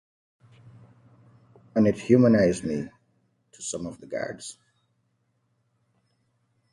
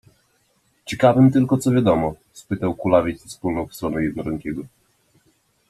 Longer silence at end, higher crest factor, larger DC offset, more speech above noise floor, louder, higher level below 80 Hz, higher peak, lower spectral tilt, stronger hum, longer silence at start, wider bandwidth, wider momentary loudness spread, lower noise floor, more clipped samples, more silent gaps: first, 2.2 s vs 1.05 s; about the same, 22 dB vs 18 dB; neither; first, 49 dB vs 45 dB; second, -24 LUFS vs -20 LUFS; second, -58 dBFS vs -50 dBFS; second, -6 dBFS vs -2 dBFS; about the same, -6.5 dB/octave vs -7.5 dB/octave; neither; first, 1.75 s vs 0.85 s; second, 11.5 kHz vs 13.5 kHz; first, 19 LU vs 15 LU; first, -72 dBFS vs -64 dBFS; neither; neither